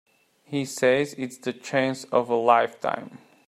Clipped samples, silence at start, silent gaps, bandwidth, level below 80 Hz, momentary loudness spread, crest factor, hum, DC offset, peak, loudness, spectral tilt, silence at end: under 0.1%; 0.5 s; none; 14.5 kHz; -72 dBFS; 12 LU; 20 dB; none; under 0.1%; -4 dBFS; -25 LUFS; -4.5 dB/octave; 0.3 s